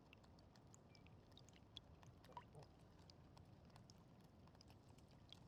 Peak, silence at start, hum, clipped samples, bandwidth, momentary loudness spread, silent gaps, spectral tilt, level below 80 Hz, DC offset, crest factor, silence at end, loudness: -38 dBFS; 0 s; none; under 0.1%; 13 kHz; 6 LU; none; -5 dB/octave; -76 dBFS; under 0.1%; 26 dB; 0 s; -66 LUFS